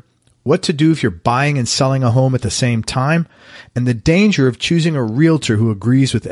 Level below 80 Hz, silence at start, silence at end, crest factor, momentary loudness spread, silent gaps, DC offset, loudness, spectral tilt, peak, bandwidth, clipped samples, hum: -42 dBFS; 0.45 s; 0 s; 14 dB; 5 LU; none; under 0.1%; -15 LUFS; -5.5 dB/octave; -2 dBFS; 11.5 kHz; under 0.1%; none